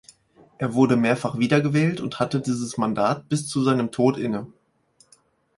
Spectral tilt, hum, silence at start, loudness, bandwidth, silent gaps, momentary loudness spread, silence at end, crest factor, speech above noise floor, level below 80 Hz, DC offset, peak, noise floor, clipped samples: -6.5 dB/octave; none; 0.6 s; -23 LUFS; 11.5 kHz; none; 8 LU; 1.1 s; 18 dB; 39 dB; -60 dBFS; under 0.1%; -6 dBFS; -61 dBFS; under 0.1%